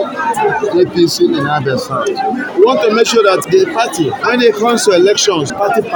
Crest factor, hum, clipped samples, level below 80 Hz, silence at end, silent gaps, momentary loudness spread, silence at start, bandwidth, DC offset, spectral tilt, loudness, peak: 12 dB; none; 0.2%; -54 dBFS; 0 s; none; 7 LU; 0 s; 17.5 kHz; under 0.1%; -4 dB/octave; -12 LUFS; 0 dBFS